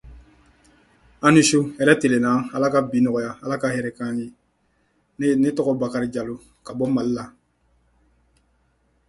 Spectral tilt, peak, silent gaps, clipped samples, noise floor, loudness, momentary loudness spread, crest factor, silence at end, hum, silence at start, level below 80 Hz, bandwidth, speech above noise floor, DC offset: -5 dB/octave; 0 dBFS; none; under 0.1%; -66 dBFS; -21 LUFS; 14 LU; 22 dB; 1.8 s; none; 0.05 s; -56 dBFS; 11.5 kHz; 46 dB; under 0.1%